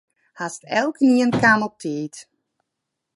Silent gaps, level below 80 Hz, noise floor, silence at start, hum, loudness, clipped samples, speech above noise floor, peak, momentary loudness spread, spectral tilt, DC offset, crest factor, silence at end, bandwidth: none; -60 dBFS; -80 dBFS; 0.4 s; none; -19 LUFS; under 0.1%; 61 dB; -2 dBFS; 15 LU; -5 dB/octave; under 0.1%; 20 dB; 0.95 s; 11.5 kHz